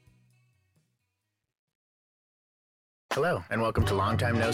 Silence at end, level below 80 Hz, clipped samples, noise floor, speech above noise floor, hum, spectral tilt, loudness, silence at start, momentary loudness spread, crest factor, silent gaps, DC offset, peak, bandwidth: 0 s; -50 dBFS; under 0.1%; -82 dBFS; 55 dB; none; -6 dB/octave; -28 LUFS; 3.1 s; 3 LU; 18 dB; none; under 0.1%; -14 dBFS; 15.5 kHz